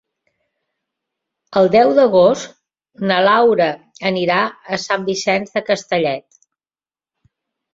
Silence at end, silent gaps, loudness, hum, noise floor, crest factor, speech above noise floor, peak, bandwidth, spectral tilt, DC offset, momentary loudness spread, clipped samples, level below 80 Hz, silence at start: 1.55 s; none; -16 LUFS; none; under -90 dBFS; 16 dB; over 75 dB; -2 dBFS; 7.8 kHz; -4.5 dB/octave; under 0.1%; 11 LU; under 0.1%; -60 dBFS; 1.5 s